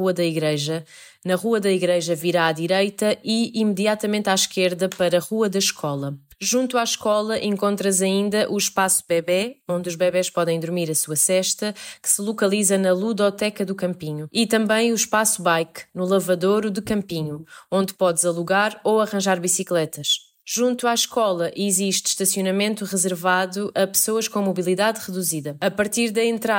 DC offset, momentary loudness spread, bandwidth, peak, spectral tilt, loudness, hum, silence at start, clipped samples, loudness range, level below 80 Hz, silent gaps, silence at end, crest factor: under 0.1%; 7 LU; 16.5 kHz; -4 dBFS; -3.5 dB/octave; -21 LUFS; none; 0 s; under 0.1%; 1 LU; -64 dBFS; none; 0 s; 16 dB